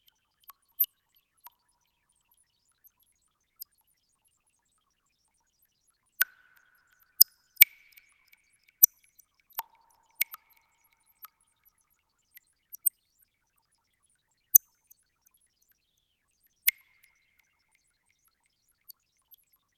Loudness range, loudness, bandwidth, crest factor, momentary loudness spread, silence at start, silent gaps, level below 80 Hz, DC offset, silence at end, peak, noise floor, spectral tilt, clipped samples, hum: 14 LU; -24 LUFS; 18 kHz; 32 dB; 28 LU; 0.8 s; none; -86 dBFS; under 0.1%; 3.05 s; -2 dBFS; -76 dBFS; 6 dB/octave; under 0.1%; none